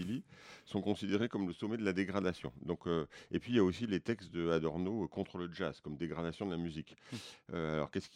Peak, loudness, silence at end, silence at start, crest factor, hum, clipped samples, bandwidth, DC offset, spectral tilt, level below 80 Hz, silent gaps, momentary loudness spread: -18 dBFS; -38 LUFS; 0.1 s; 0 s; 20 dB; none; under 0.1%; 11.5 kHz; under 0.1%; -6.5 dB/octave; -64 dBFS; none; 10 LU